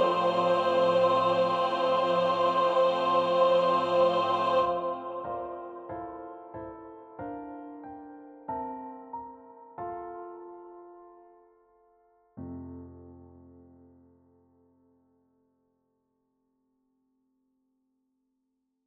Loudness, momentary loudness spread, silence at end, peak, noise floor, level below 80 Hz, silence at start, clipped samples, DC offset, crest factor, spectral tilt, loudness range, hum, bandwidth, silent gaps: -27 LUFS; 22 LU; 5.6 s; -12 dBFS; -80 dBFS; -68 dBFS; 0 s; under 0.1%; under 0.1%; 18 dB; -6 dB/octave; 24 LU; none; 7.8 kHz; none